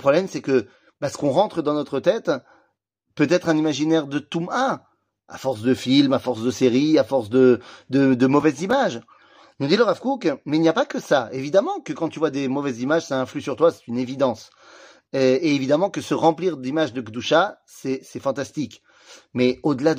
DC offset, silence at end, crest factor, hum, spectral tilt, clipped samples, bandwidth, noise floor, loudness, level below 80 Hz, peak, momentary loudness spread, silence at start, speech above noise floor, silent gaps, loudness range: under 0.1%; 0 s; 18 dB; none; -5.5 dB/octave; under 0.1%; 15.5 kHz; -73 dBFS; -21 LUFS; -66 dBFS; -4 dBFS; 11 LU; 0 s; 52 dB; none; 4 LU